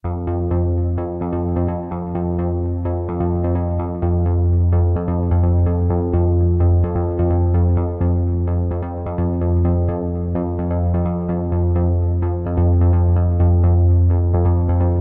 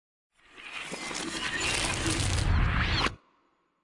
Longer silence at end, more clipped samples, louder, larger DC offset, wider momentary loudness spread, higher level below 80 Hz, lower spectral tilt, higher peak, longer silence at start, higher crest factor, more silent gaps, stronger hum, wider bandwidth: second, 0 s vs 0.65 s; neither; first, -19 LUFS vs -29 LUFS; neither; second, 7 LU vs 11 LU; first, -26 dBFS vs -36 dBFS; first, -14 dB/octave vs -3.5 dB/octave; first, -6 dBFS vs -12 dBFS; second, 0.05 s vs 0.55 s; second, 12 dB vs 18 dB; neither; neither; second, 2.3 kHz vs 11.5 kHz